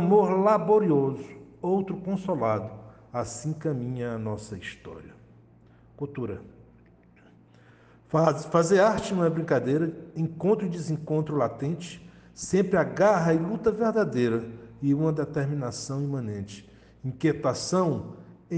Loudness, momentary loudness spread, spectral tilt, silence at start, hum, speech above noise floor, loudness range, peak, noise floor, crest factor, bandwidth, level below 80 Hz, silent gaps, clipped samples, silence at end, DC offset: -26 LUFS; 17 LU; -6.5 dB/octave; 0 s; none; 30 dB; 11 LU; -6 dBFS; -56 dBFS; 20 dB; 9.6 kHz; -60 dBFS; none; under 0.1%; 0 s; under 0.1%